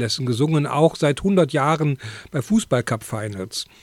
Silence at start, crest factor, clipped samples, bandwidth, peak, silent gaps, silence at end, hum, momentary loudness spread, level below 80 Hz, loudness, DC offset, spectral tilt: 0 s; 18 dB; under 0.1%; 15 kHz; -4 dBFS; none; 0.2 s; none; 11 LU; -50 dBFS; -21 LUFS; under 0.1%; -6 dB/octave